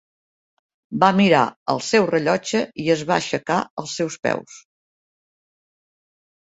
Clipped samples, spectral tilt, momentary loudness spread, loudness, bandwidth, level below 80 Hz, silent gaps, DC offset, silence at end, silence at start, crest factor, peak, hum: under 0.1%; -5 dB/octave; 10 LU; -20 LUFS; 8 kHz; -62 dBFS; 1.56-1.66 s, 3.70-3.77 s, 4.19-4.23 s; under 0.1%; 1.9 s; 0.9 s; 22 dB; 0 dBFS; none